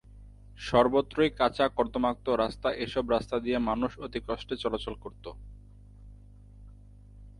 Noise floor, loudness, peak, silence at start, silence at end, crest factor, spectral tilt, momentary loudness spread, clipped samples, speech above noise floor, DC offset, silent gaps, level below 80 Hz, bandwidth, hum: -51 dBFS; -29 LUFS; -8 dBFS; 0.15 s; 0.1 s; 22 dB; -6 dB/octave; 16 LU; under 0.1%; 22 dB; under 0.1%; none; -48 dBFS; 11.5 kHz; 50 Hz at -55 dBFS